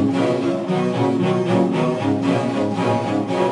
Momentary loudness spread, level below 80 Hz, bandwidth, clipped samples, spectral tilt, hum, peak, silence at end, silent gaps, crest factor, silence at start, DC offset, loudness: 3 LU; -56 dBFS; 11 kHz; under 0.1%; -7 dB/octave; none; -4 dBFS; 0 s; none; 14 dB; 0 s; under 0.1%; -20 LUFS